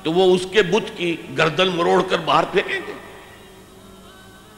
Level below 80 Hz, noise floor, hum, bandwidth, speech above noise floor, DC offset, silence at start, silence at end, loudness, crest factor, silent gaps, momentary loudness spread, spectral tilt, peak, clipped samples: -52 dBFS; -44 dBFS; none; 15 kHz; 25 dB; under 0.1%; 0 s; 0.2 s; -19 LUFS; 18 dB; none; 10 LU; -5 dB/octave; -4 dBFS; under 0.1%